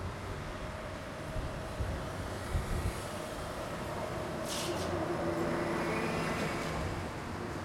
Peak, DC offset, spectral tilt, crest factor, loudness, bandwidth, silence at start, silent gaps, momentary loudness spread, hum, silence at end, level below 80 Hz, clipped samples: -20 dBFS; under 0.1%; -5 dB/octave; 16 dB; -37 LUFS; 16.5 kHz; 0 s; none; 7 LU; none; 0 s; -46 dBFS; under 0.1%